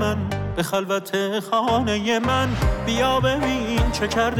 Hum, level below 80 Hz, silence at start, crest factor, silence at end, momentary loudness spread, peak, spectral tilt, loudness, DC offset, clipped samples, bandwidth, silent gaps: none; -32 dBFS; 0 s; 10 dB; 0 s; 4 LU; -12 dBFS; -5 dB/octave; -22 LUFS; under 0.1%; under 0.1%; 18.5 kHz; none